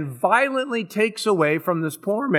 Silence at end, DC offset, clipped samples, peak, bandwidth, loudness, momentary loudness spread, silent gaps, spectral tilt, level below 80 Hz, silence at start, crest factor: 0 s; under 0.1%; under 0.1%; -4 dBFS; 18 kHz; -21 LUFS; 6 LU; none; -5.5 dB/octave; -78 dBFS; 0 s; 18 dB